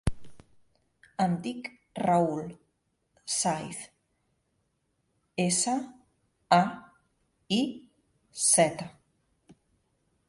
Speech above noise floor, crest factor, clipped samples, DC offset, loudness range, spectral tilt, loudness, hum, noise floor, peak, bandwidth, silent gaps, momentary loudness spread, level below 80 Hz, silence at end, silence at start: 48 dB; 24 dB; under 0.1%; under 0.1%; 5 LU; -3.5 dB/octave; -28 LUFS; none; -76 dBFS; -8 dBFS; 11.5 kHz; none; 22 LU; -54 dBFS; 1.4 s; 0.05 s